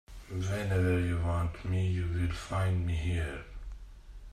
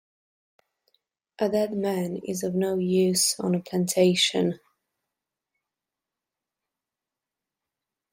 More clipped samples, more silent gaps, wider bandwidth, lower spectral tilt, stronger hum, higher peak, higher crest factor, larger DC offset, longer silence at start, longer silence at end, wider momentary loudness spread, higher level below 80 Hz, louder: neither; neither; second, 12.5 kHz vs 16.5 kHz; first, -7 dB/octave vs -4 dB/octave; neither; second, -16 dBFS vs -10 dBFS; about the same, 16 dB vs 20 dB; neither; second, 0.1 s vs 1.4 s; second, 0 s vs 3.55 s; first, 16 LU vs 9 LU; first, -44 dBFS vs -70 dBFS; second, -32 LUFS vs -24 LUFS